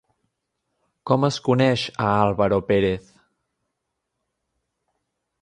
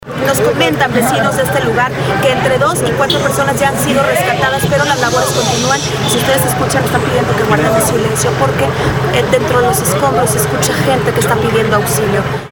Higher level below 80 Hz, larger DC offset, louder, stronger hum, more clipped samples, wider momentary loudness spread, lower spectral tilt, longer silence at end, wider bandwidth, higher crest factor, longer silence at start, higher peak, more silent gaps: second, -52 dBFS vs -36 dBFS; neither; second, -21 LUFS vs -12 LUFS; neither; neither; first, 5 LU vs 2 LU; first, -6.5 dB/octave vs -4 dB/octave; first, 2.4 s vs 0.05 s; second, 10.5 kHz vs 19 kHz; first, 20 dB vs 12 dB; first, 1.05 s vs 0.05 s; second, -4 dBFS vs 0 dBFS; neither